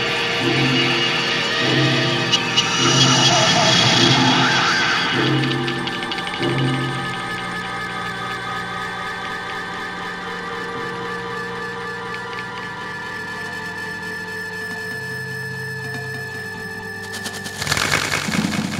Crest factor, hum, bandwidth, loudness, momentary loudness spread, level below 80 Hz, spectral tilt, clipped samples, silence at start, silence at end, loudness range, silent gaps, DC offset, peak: 18 dB; none; 16 kHz; -19 LUFS; 14 LU; -50 dBFS; -3 dB/octave; under 0.1%; 0 s; 0 s; 13 LU; none; under 0.1%; -2 dBFS